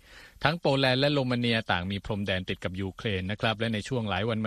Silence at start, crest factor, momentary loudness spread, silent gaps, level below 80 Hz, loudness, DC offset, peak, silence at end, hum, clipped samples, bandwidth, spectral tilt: 0.1 s; 22 dB; 9 LU; none; -54 dBFS; -28 LUFS; under 0.1%; -6 dBFS; 0 s; none; under 0.1%; 13.5 kHz; -6 dB/octave